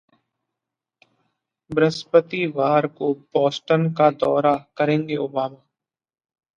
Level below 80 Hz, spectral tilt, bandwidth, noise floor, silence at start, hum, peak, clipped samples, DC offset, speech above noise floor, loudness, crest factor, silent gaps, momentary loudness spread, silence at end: -66 dBFS; -7 dB/octave; 9.2 kHz; -86 dBFS; 1.7 s; none; -2 dBFS; under 0.1%; under 0.1%; 66 dB; -21 LUFS; 20 dB; none; 8 LU; 1 s